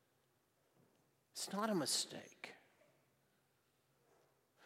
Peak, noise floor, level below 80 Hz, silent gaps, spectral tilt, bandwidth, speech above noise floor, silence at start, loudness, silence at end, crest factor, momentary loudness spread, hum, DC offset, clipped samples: -24 dBFS; -80 dBFS; under -90 dBFS; none; -2.5 dB/octave; 16 kHz; 37 dB; 1.35 s; -40 LUFS; 0 s; 24 dB; 18 LU; none; under 0.1%; under 0.1%